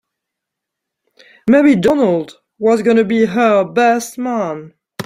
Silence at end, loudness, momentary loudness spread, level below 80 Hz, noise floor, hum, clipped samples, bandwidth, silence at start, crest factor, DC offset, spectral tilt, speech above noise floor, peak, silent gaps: 0 s; -14 LUFS; 12 LU; -54 dBFS; -80 dBFS; none; under 0.1%; 15.5 kHz; 1.45 s; 14 dB; under 0.1%; -6 dB/octave; 67 dB; -2 dBFS; none